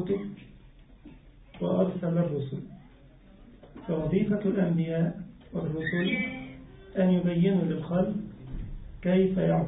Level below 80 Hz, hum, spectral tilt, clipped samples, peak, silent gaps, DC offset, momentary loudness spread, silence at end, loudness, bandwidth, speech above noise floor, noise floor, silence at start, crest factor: -50 dBFS; none; -12 dB/octave; under 0.1%; -12 dBFS; none; under 0.1%; 17 LU; 0 s; -28 LUFS; 3.9 kHz; 27 dB; -53 dBFS; 0 s; 16 dB